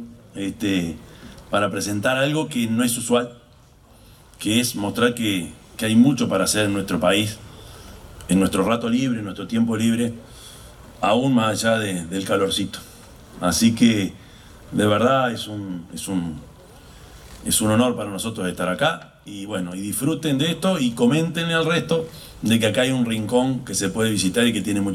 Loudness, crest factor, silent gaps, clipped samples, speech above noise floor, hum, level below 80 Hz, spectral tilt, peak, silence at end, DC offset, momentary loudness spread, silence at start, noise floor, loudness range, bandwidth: -21 LUFS; 18 dB; none; under 0.1%; 30 dB; none; -50 dBFS; -4.5 dB/octave; -4 dBFS; 0 s; under 0.1%; 15 LU; 0 s; -51 dBFS; 3 LU; 16 kHz